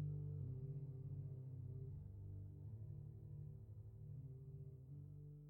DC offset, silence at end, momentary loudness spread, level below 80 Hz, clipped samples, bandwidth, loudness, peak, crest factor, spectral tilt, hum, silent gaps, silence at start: under 0.1%; 0 s; 8 LU; -66 dBFS; under 0.1%; 1.4 kHz; -54 LUFS; -38 dBFS; 14 dB; -11.5 dB/octave; 50 Hz at -70 dBFS; none; 0 s